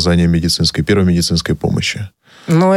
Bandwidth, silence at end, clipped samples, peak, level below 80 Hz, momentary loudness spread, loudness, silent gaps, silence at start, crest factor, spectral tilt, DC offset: 14 kHz; 0 s; under 0.1%; 0 dBFS; -32 dBFS; 12 LU; -14 LUFS; none; 0 s; 12 dB; -5.5 dB/octave; under 0.1%